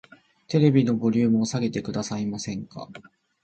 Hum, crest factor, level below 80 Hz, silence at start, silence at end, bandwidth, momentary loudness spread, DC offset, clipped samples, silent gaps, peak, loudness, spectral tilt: none; 18 dB; -60 dBFS; 0.5 s; 0.4 s; 8.8 kHz; 17 LU; under 0.1%; under 0.1%; none; -8 dBFS; -24 LUFS; -6.5 dB/octave